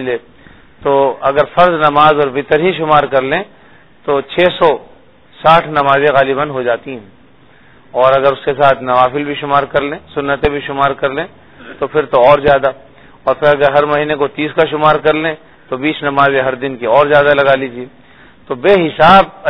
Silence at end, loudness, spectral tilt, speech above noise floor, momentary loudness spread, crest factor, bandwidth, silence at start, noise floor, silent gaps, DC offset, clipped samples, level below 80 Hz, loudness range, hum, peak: 0 s; -12 LUFS; -8 dB/octave; 34 dB; 12 LU; 12 dB; 5.4 kHz; 0 s; -45 dBFS; none; under 0.1%; 0.4%; -40 dBFS; 2 LU; none; 0 dBFS